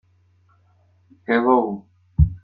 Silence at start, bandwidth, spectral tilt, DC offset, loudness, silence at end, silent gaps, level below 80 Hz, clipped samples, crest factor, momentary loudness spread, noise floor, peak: 1.3 s; 4.8 kHz; -11.5 dB/octave; under 0.1%; -20 LUFS; 0.05 s; none; -32 dBFS; under 0.1%; 20 dB; 17 LU; -59 dBFS; -4 dBFS